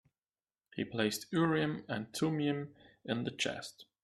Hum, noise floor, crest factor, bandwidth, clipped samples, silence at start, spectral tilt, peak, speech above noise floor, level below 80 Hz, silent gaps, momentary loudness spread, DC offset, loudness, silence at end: none; under -90 dBFS; 18 dB; 14 kHz; under 0.1%; 0.75 s; -5 dB/octave; -18 dBFS; over 55 dB; -72 dBFS; none; 16 LU; under 0.1%; -35 LUFS; 0.2 s